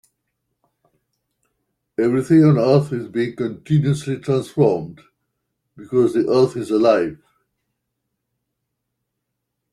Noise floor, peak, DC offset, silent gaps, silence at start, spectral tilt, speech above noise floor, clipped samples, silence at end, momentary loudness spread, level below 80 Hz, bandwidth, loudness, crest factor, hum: -78 dBFS; -2 dBFS; under 0.1%; none; 2 s; -8 dB/octave; 61 dB; under 0.1%; 2.55 s; 11 LU; -60 dBFS; 11.5 kHz; -18 LUFS; 18 dB; none